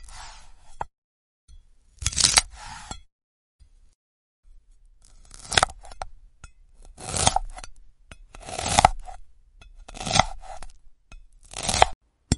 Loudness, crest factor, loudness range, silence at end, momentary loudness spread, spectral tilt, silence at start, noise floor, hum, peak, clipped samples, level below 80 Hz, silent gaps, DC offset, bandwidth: -22 LUFS; 28 dB; 5 LU; 0 s; 24 LU; -2 dB/octave; 0 s; -54 dBFS; none; 0 dBFS; under 0.1%; -40 dBFS; 0.98-1.48 s, 3.12-3.59 s, 3.95-4.43 s, 11.95-12.01 s; under 0.1%; 11.5 kHz